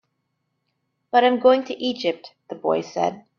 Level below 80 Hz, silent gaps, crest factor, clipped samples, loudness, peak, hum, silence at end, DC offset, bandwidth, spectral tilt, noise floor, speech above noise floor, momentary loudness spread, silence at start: -68 dBFS; none; 20 dB; under 0.1%; -21 LUFS; -4 dBFS; none; 0.2 s; under 0.1%; 6.8 kHz; -5 dB/octave; -75 dBFS; 54 dB; 12 LU; 1.15 s